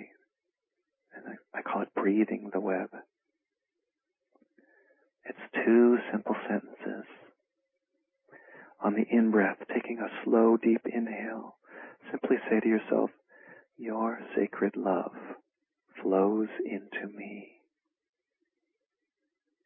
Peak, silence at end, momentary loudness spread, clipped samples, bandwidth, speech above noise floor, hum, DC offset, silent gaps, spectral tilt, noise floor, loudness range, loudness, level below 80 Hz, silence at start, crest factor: -12 dBFS; 2.2 s; 22 LU; under 0.1%; 3.7 kHz; 61 dB; none; under 0.1%; none; -10.5 dB/octave; -89 dBFS; 6 LU; -29 LUFS; -84 dBFS; 0 s; 20 dB